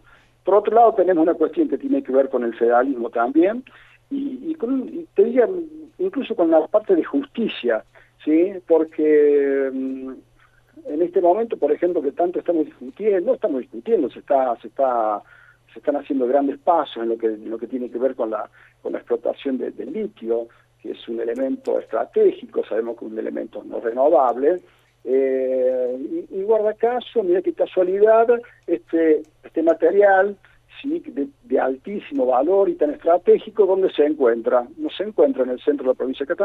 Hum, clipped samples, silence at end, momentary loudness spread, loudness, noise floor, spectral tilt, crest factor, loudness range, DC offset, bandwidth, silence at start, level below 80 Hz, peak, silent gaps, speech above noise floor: none; under 0.1%; 0 s; 12 LU; -20 LUFS; -53 dBFS; -7.5 dB/octave; 16 dB; 5 LU; under 0.1%; 4.1 kHz; 0.45 s; -64 dBFS; -4 dBFS; none; 33 dB